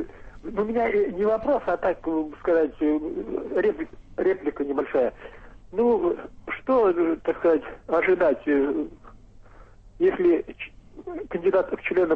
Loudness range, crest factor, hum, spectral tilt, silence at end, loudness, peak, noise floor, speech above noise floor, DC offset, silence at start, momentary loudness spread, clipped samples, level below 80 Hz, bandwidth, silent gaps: 3 LU; 14 dB; none; -8 dB/octave; 0 s; -24 LUFS; -12 dBFS; -48 dBFS; 25 dB; under 0.1%; 0 s; 13 LU; under 0.1%; -50 dBFS; 5.4 kHz; none